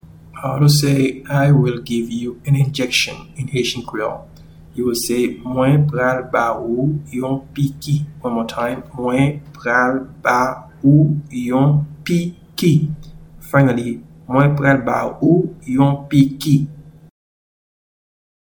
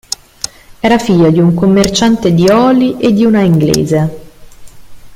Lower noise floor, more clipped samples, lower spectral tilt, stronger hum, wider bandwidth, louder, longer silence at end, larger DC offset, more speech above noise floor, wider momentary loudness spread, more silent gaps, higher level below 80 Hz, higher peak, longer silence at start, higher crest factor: first, -37 dBFS vs -32 dBFS; neither; about the same, -6 dB/octave vs -6 dB/octave; neither; first, 19 kHz vs 16 kHz; second, -17 LUFS vs -10 LUFS; first, 1.5 s vs 0 s; neither; about the same, 20 dB vs 23 dB; about the same, 10 LU vs 12 LU; neither; second, -46 dBFS vs -38 dBFS; about the same, 0 dBFS vs 0 dBFS; second, 0.35 s vs 0.7 s; first, 18 dB vs 10 dB